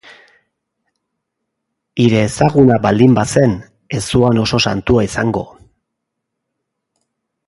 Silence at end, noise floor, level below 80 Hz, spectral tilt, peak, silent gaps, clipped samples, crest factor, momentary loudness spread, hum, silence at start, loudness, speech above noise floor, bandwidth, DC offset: 2.05 s; -76 dBFS; -40 dBFS; -6 dB/octave; 0 dBFS; none; under 0.1%; 16 dB; 13 LU; none; 1.95 s; -14 LUFS; 64 dB; 11.5 kHz; under 0.1%